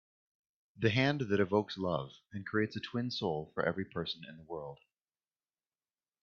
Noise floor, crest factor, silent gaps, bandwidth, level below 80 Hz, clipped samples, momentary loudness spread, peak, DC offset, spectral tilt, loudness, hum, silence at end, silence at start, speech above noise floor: under -90 dBFS; 22 dB; none; 7 kHz; -70 dBFS; under 0.1%; 14 LU; -16 dBFS; under 0.1%; -6.5 dB/octave; -35 LUFS; none; 1.5 s; 0.75 s; over 55 dB